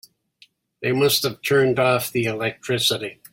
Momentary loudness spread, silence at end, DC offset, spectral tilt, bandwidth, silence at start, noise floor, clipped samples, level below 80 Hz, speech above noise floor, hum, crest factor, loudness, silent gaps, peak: 7 LU; 0.2 s; under 0.1%; -4 dB/octave; 16.5 kHz; 0.8 s; -57 dBFS; under 0.1%; -60 dBFS; 36 dB; none; 18 dB; -21 LUFS; none; -4 dBFS